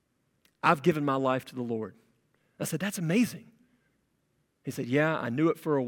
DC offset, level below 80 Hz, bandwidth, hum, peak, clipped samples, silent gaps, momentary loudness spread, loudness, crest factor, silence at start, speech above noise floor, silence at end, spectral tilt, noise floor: under 0.1%; -74 dBFS; 18 kHz; none; -6 dBFS; under 0.1%; none; 12 LU; -29 LUFS; 24 dB; 0.65 s; 46 dB; 0 s; -6 dB/octave; -74 dBFS